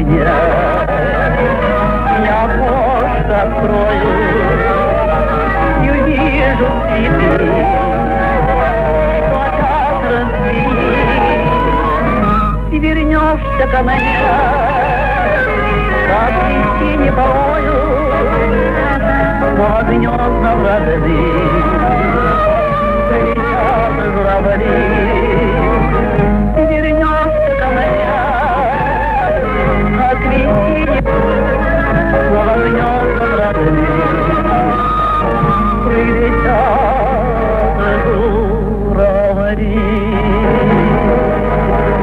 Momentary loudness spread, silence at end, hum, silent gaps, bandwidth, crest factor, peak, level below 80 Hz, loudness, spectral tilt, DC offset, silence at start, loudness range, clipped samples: 2 LU; 0 s; none; none; 5 kHz; 12 dB; 0 dBFS; -20 dBFS; -13 LUFS; -8.5 dB/octave; under 0.1%; 0 s; 1 LU; under 0.1%